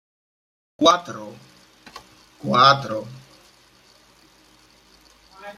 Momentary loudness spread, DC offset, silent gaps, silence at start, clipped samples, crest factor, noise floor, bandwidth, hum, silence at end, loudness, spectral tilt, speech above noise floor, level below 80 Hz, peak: 28 LU; under 0.1%; none; 0.8 s; under 0.1%; 24 dB; -54 dBFS; 14 kHz; none; 0.05 s; -18 LUFS; -4 dB/octave; 35 dB; -64 dBFS; -2 dBFS